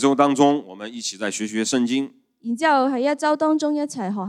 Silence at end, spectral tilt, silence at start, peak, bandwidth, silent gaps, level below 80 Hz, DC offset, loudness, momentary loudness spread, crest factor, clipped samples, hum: 0 s; -4 dB/octave; 0 s; -2 dBFS; 12 kHz; none; -78 dBFS; under 0.1%; -21 LUFS; 11 LU; 18 dB; under 0.1%; none